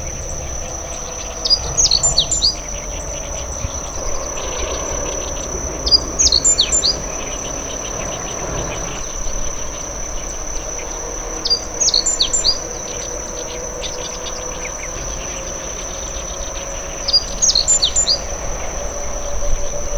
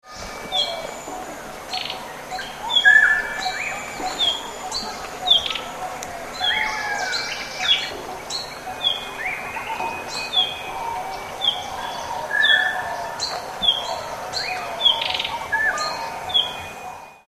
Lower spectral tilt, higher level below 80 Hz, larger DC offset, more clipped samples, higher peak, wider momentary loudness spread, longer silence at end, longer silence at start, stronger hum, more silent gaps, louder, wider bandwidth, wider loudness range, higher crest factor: about the same, -1 dB/octave vs -0.5 dB/octave; first, -28 dBFS vs -50 dBFS; neither; neither; about the same, 0 dBFS vs -2 dBFS; about the same, 13 LU vs 14 LU; about the same, 0 s vs 0.1 s; about the same, 0 s vs 0.05 s; neither; neither; first, -18 LUFS vs -21 LUFS; first, over 20 kHz vs 14 kHz; first, 9 LU vs 5 LU; about the same, 20 dB vs 22 dB